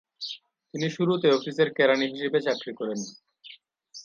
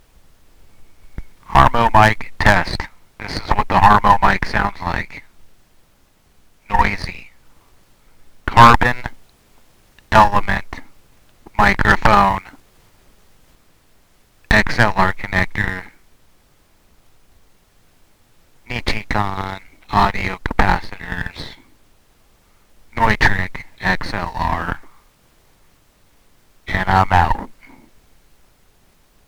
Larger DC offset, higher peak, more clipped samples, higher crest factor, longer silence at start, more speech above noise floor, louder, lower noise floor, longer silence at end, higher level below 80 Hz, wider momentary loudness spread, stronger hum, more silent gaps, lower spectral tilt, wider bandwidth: neither; second, -8 dBFS vs 0 dBFS; second, under 0.1% vs 0.2%; about the same, 18 dB vs 18 dB; second, 0.2 s vs 0.8 s; second, 26 dB vs 41 dB; second, -26 LUFS vs -16 LUFS; about the same, -51 dBFS vs -54 dBFS; second, 0 s vs 1.75 s; second, -78 dBFS vs -30 dBFS; second, 17 LU vs 20 LU; neither; neither; about the same, -5 dB/octave vs -5.5 dB/octave; second, 7.6 kHz vs over 20 kHz